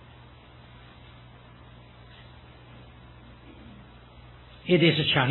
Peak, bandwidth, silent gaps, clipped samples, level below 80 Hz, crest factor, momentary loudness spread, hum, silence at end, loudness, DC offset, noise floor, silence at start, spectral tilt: -8 dBFS; 4.2 kHz; none; under 0.1%; -54 dBFS; 24 dB; 29 LU; none; 0 s; -23 LUFS; under 0.1%; -50 dBFS; 4.65 s; -9 dB/octave